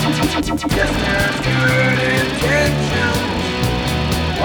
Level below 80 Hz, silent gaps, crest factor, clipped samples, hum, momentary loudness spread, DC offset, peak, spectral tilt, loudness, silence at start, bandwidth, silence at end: -28 dBFS; none; 14 dB; under 0.1%; none; 4 LU; under 0.1%; -2 dBFS; -5 dB/octave; -17 LUFS; 0 s; over 20 kHz; 0 s